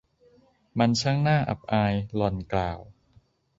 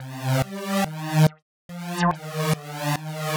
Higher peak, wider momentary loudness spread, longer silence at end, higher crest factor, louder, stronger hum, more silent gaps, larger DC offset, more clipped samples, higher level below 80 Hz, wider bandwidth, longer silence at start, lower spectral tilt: about the same, -8 dBFS vs -6 dBFS; about the same, 9 LU vs 8 LU; first, 0.75 s vs 0 s; about the same, 20 dB vs 18 dB; about the same, -26 LUFS vs -25 LUFS; neither; second, none vs 1.42-1.69 s; neither; neither; first, -48 dBFS vs -54 dBFS; second, 8 kHz vs over 20 kHz; first, 0.75 s vs 0 s; about the same, -6 dB/octave vs -5.5 dB/octave